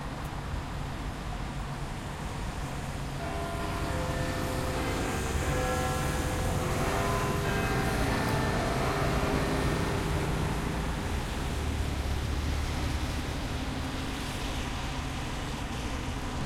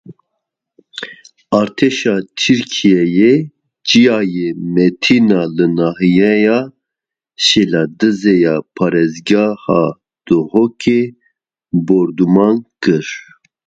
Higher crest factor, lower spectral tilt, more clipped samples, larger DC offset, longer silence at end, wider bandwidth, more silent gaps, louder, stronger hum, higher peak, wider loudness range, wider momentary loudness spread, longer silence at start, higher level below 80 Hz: about the same, 18 dB vs 14 dB; about the same, -5 dB/octave vs -5.5 dB/octave; neither; neither; second, 0 s vs 0.45 s; first, 16.5 kHz vs 9.2 kHz; neither; second, -32 LUFS vs -13 LUFS; neither; second, -14 dBFS vs 0 dBFS; first, 6 LU vs 3 LU; about the same, 8 LU vs 9 LU; about the same, 0 s vs 0.1 s; first, -36 dBFS vs -54 dBFS